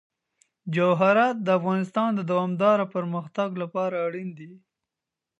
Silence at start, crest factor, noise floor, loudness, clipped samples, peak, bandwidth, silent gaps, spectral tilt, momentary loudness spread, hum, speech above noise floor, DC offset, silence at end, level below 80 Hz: 0.65 s; 18 dB; -87 dBFS; -24 LUFS; under 0.1%; -6 dBFS; 8.2 kHz; none; -7.5 dB/octave; 11 LU; none; 63 dB; under 0.1%; 0.8 s; -78 dBFS